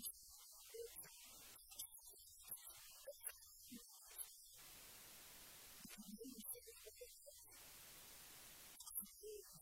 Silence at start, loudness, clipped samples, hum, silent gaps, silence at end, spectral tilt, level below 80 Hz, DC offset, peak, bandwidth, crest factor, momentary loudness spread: 0 s; -56 LUFS; under 0.1%; none; none; 0 s; -1.5 dB/octave; -78 dBFS; under 0.1%; -34 dBFS; 16.5 kHz; 24 dB; 7 LU